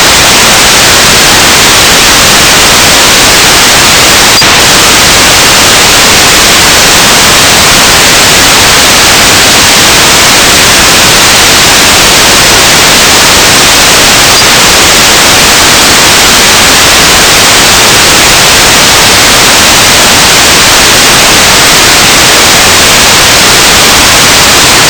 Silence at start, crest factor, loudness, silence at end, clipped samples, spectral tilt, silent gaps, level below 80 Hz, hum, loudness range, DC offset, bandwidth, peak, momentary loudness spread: 0 s; 2 dB; 0 LUFS; 0 s; 40%; -1 dB/octave; none; -22 dBFS; none; 0 LU; 0.3%; over 20 kHz; 0 dBFS; 0 LU